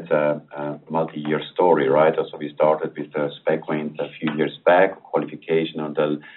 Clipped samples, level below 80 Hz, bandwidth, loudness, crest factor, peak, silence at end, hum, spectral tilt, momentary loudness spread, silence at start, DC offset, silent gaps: under 0.1%; -70 dBFS; 4.2 kHz; -22 LUFS; 18 dB; -4 dBFS; 0.05 s; none; -4.5 dB/octave; 10 LU; 0 s; under 0.1%; none